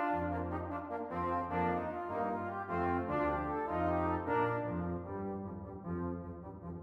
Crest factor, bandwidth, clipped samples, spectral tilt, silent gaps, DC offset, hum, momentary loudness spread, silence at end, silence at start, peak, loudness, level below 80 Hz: 14 dB; 6 kHz; under 0.1%; -9.5 dB/octave; none; under 0.1%; none; 9 LU; 0 s; 0 s; -22 dBFS; -37 LUFS; -56 dBFS